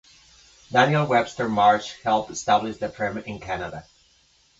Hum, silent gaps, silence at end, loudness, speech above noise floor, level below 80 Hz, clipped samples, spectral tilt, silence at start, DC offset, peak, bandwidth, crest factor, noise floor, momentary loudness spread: none; none; 0.8 s; -23 LUFS; 38 dB; -56 dBFS; under 0.1%; -5 dB/octave; 0.7 s; under 0.1%; -4 dBFS; 7.8 kHz; 20 dB; -60 dBFS; 12 LU